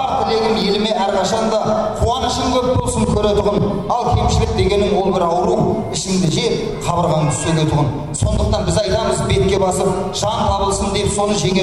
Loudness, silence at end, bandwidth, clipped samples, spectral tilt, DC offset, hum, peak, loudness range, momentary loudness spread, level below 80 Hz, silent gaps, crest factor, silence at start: -17 LUFS; 0 s; 13.5 kHz; under 0.1%; -5 dB/octave; under 0.1%; none; -4 dBFS; 1 LU; 3 LU; -28 dBFS; none; 12 dB; 0 s